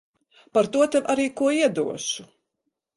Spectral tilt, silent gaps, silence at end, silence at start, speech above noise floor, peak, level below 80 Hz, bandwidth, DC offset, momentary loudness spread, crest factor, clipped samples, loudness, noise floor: -3.5 dB/octave; none; 0.7 s; 0.55 s; 57 dB; -8 dBFS; -66 dBFS; 11.5 kHz; under 0.1%; 8 LU; 16 dB; under 0.1%; -23 LUFS; -79 dBFS